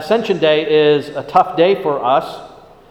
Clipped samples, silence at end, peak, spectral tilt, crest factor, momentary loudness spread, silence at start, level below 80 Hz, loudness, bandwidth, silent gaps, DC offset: under 0.1%; 0.4 s; 0 dBFS; -6 dB/octave; 16 dB; 5 LU; 0 s; -54 dBFS; -15 LUFS; 13.5 kHz; none; under 0.1%